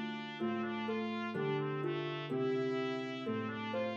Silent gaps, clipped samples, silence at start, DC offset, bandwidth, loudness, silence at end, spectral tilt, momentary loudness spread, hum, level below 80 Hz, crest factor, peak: none; under 0.1%; 0 s; under 0.1%; 7.6 kHz; -38 LUFS; 0 s; -7 dB/octave; 4 LU; none; -88 dBFS; 12 dB; -24 dBFS